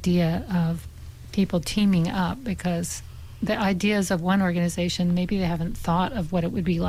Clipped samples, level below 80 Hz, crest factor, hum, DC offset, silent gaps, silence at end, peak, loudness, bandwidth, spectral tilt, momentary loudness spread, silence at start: under 0.1%; -42 dBFS; 12 dB; none; under 0.1%; none; 0 s; -12 dBFS; -25 LUFS; 15 kHz; -6 dB/octave; 9 LU; 0 s